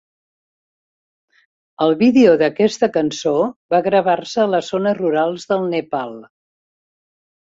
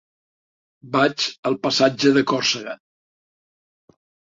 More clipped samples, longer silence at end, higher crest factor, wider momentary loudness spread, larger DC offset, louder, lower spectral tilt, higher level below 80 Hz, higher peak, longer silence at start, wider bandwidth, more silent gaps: neither; second, 1.25 s vs 1.55 s; about the same, 16 dB vs 20 dB; about the same, 9 LU vs 10 LU; neither; first, -17 LUFS vs -20 LUFS; first, -5.5 dB/octave vs -4 dB/octave; about the same, -62 dBFS vs -66 dBFS; about the same, -2 dBFS vs -4 dBFS; first, 1.8 s vs 0.85 s; about the same, 7.8 kHz vs 7.8 kHz; first, 3.56-3.69 s vs 1.39-1.43 s